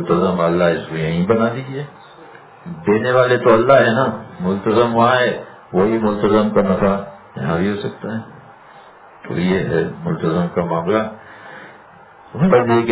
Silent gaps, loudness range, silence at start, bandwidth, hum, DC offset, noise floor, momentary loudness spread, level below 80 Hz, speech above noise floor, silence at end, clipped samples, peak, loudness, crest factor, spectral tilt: none; 7 LU; 0 s; 4 kHz; none; under 0.1%; -43 dBFS; 16 LU; -48 dBFS; 27 dB; 0 s; under 0.1%; 0 dBFS; -17 LUFS; 18 dB; -11 dB/octave